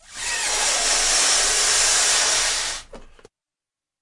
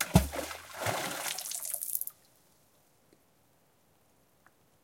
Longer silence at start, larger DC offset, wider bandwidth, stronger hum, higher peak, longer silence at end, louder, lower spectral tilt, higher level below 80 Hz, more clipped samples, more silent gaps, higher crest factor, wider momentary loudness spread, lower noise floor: about the same, 0.1 s vs 0 s; neither; second, 11.5 kHz vs 17 kHz; neither; about the same, -6 dBFS vs -6 dBFS; second, 0.95 s vs 2.75 s; first, -17 LUFS vs -34 LUFS; second, 2 dB/octave vs -4 dB/octave; about the same, -44 dBFS vs -48 dBFS; neither; neither; second, 16 dB vs 30 dB; about the same, 9 LU vs 11 LU; first, -89 dBFS vs -68 dBFS